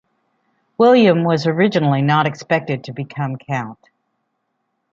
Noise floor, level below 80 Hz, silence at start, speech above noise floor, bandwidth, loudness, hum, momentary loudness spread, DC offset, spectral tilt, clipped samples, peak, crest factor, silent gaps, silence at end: -72 dBFS; -62 dBFS; 0.8 s; 56 dB; 7.6 kHz; -17 LUFS; none; 13 LU; under 0.1%; -7.5 dB/octave; under 0.1%; -2 dBFS; 16 dB; none; 1.2 s